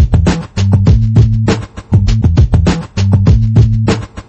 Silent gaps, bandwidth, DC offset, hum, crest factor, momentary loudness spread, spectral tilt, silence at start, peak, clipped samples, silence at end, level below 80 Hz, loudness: none; 8.4 kHz; under 0.1%; none; 10 dB; 6 LU; -7.5 dB/octave; 0 s; 0 dBFS; under 0.1%; 0.05 s; -16 dBFS; -11 LUFS